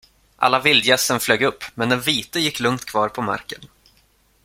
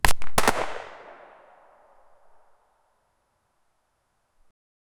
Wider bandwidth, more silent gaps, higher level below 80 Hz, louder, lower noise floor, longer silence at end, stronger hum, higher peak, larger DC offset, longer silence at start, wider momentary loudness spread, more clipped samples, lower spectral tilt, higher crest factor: second, 16.5 kHz vs over 20 kHz; neither; second, -56 dBFS vs -38 dBFS; first, -19 LUFS vs -26 LUFS; second, -59 dBFS vs -72 dBFS; second, 0.8 s vs 4.05 s; neither; about the same, -2 dBFS vs 0 dBFS; neither; first, 0.4 s vs 0.05 s; second, 11 LU vs 25 LU; neither; about the same, -3 dB/octave vs -2.5 dB/octave; second, 20 dB vs 26 dB